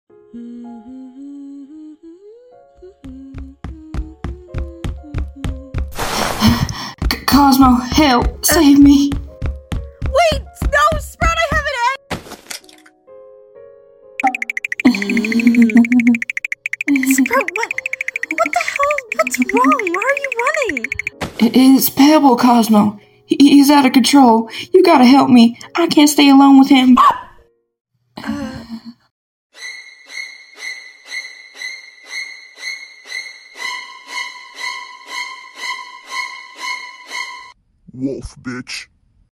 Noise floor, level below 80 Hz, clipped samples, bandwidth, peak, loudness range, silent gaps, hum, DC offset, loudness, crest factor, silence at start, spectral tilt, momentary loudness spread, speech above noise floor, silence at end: -50 dBFS; -32 dBFS; under 0.1%; 17 kHz; 0 dBFS; 19 LU; 27.81-27.85 s, 29.11-29.50 s; none; under 0.1%; -13 LUFS; 16 dB; 0.35 s; -4.5 dB/octave; 22 LU; 40 dB; 0.5 s